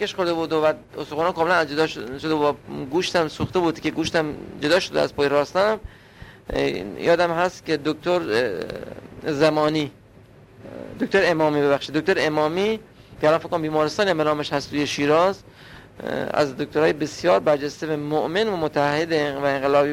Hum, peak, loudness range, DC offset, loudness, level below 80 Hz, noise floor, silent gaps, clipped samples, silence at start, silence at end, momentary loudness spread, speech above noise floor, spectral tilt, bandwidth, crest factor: none; -4 dBFS; 2 LU; under 0.1%; -22 LUFS; -50 dBFS; -48 dBFS; none; under 0.1%; 0 s; 0 s; 10 LU; 27 dB; -5 dB/octave; 16 kHz; 18 dB